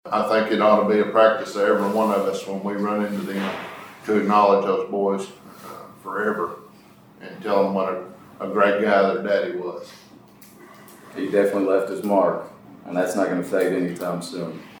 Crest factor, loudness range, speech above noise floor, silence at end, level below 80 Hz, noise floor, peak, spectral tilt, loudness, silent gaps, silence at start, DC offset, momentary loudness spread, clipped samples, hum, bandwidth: 20 dB; 5 LU; 28 dB; 0 s; -72 dBFS; -49 dBFS; -2 dBFS; -6 dB/octave; -22 LUFS; none; 0.05 s; under 0.1%; 19 LU; under 0.1%; none; over 20 kHz